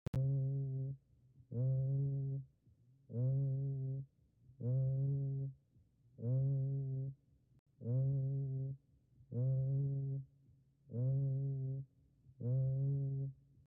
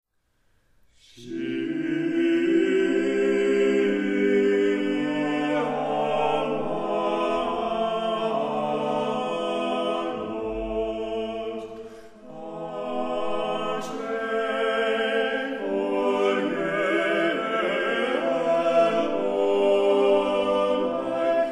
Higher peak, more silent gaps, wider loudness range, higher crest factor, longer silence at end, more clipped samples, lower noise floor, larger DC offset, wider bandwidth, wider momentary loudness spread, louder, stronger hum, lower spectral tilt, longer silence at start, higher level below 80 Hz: second, -28 dBFS vs -10 dBFS; first, 7.59-7.66 s vs none; second, 1 LU vs 8 LU; second, 10 dB vs 16 dB; first, 0.35 s vs 0 s; neither; about the same, -71 dBFS vs -68 dBFS; neither; second, 1.2 kHz vs 11 kHz; about the same, 11 LU vs 9 LU; second, -40 LUFS vs -24 LUFS; neither; first, -15 dB/octave vs -5.5 dB/octave; second, 0.15 s vs 1.15 s; second, -68 dBFS vs -56 dBFS